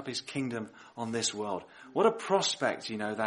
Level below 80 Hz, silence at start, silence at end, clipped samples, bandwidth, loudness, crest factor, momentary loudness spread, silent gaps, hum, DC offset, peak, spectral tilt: -76 dBFS; 0 s; 0 s; under 0.1%; 11.5 kHz; -32 LUFS; 20 dB; 12 LU; none; none; under 0.1%; -12 dBFS; -3 dB/octave